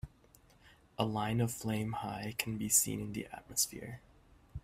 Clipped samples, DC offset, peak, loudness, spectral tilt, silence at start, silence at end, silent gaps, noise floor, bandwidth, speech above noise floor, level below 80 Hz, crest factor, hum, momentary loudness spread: under 0.1%; under 0.1%; -14 dBFS; -34 LUFS; -3.5 dB/octave; 0.05 s; 0.05 s; none; -64 dBFS; 16 kHz; 28 dB; -60 dBFS; 24 dB; none; 22 LU